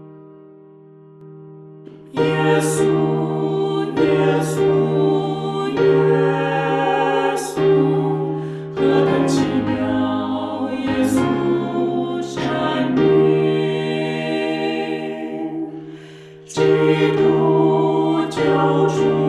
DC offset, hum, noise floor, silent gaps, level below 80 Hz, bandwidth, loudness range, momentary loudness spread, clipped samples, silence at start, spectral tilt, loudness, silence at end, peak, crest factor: under 0.1%; none; -44 dBFS; none; -54 dBFS; 13 kHz; 3 LU; 9 LU; under 0.1%; 0 s; -6.5 dB/octave; -18 LUFS; 0 s; -4 dBFS; 14 dB